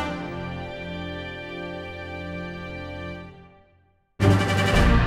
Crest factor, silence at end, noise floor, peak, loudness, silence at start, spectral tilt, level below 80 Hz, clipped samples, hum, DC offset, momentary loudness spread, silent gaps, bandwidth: 20 dB; 0 s; -62 dBFS; -4 dBFS; -27 LUFS; 0 s; -6 dB/octave; -32 dBFS; under 0.1%; none; under 0.1%; 15 LU; none; 14.5 kHz